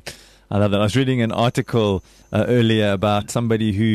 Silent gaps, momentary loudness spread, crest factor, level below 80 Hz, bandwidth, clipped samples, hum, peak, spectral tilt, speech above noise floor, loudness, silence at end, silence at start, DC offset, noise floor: none; 7 LU; 12 dB; -48 dBFS; 13.5 kHz; under 0.1%; none; -6 dBFS; -6.5 dB/octave; 21 dB; -19 LUFS; 0 s; 0.05 s; under 0.1%; -39 dBFS